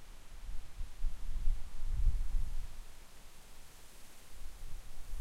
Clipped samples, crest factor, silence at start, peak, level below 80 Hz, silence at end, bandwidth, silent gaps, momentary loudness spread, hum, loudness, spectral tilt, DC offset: under 0.1%; 16 dB; 0 s; -18 dBFS; -36 dBFS; 0 s; 12.5 kHz; none; 18 LU; none; -45 LUFS; -4.5 dB/octave; under 0.1%